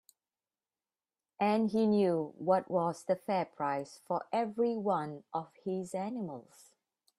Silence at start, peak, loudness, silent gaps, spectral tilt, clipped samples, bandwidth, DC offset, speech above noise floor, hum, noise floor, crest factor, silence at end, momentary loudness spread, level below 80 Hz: 1.4 s; -16 dBFS; -33 LUFS; none; -7 dB/octave; under 0.1%; 13 kHz; under 0.1%; over 57 dB; none; under -90 dBFS; 18 dB; 0.8 s; 10 LU; -80 dBFS